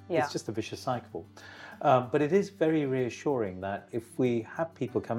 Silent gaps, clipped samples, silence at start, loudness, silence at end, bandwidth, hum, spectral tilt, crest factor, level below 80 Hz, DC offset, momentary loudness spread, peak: none; under 0.1%; 0 s; -30 LUFS; 0 s; 15.5 kHz; none; -6.5 dB/octave; 20 dB; -72 dBFS; under 0.1%; 14 LU; -10 dBFS